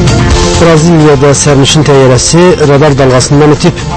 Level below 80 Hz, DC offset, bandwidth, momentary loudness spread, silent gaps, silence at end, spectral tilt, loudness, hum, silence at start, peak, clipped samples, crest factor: -18 dBFS; under 0.1%; 11 kHz; 2 LU; none; 0 s; -5 dB/octave; -4 LUFS; none; 0 s; 0 dBFS; 7%; 4 dB